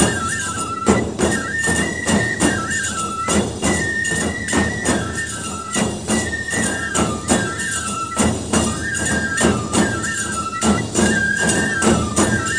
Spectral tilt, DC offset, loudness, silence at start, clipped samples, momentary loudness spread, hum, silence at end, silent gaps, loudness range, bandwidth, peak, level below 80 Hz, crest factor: -3.5 dB/octave; 0.2%; -19 LUFS; 0 s; under 0.1%; 5 LU; none; 0 s; none; 2 LU; 10.5 kHz; 0 dBFS; -36 dBFS; 18 dB